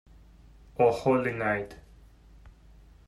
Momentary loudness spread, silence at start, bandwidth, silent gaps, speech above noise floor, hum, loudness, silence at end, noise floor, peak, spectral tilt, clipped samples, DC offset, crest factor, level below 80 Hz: 17 LU; 0.8 s; 12 kHz; none; 28 dB; none; -27 LUFS; 0.55 s; -54 dBFS; -12 dBFS; -7 dB/octave; under 0.1%; under 0.1%; 20 dB; -54 dBFS